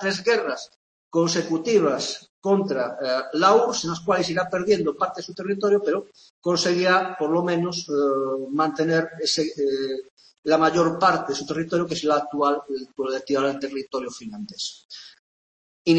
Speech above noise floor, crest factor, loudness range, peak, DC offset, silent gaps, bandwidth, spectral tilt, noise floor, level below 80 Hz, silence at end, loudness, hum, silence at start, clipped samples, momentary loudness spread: over 67 dB; 20 dB; 4 LU; -4 dBFS; under 0.1%; 0.76-1.11 s, 2.29-2.42 s, 6.30-6.42 s, 10.11-10.17 s, 10.38-10.43 s, 14.85-14.89 s, 15.19-15.85 s; 8.8 kHz; -4.5 dB/octave; under -90 dBFS; -64 dBFS; 0 s; -23 LUFS; none; 0 s; under 0.1%; 12 LU